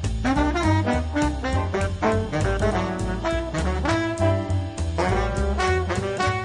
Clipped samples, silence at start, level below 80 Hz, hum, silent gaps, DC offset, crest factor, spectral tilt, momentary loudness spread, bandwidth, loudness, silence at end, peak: under 0.1%; 0 s; -32 dBFS; none; none; under 0.1%; 14 dB; -6 dB/octave; 4 LU; 11 kHz; -24 LUFS; 0 s; -8 dBFS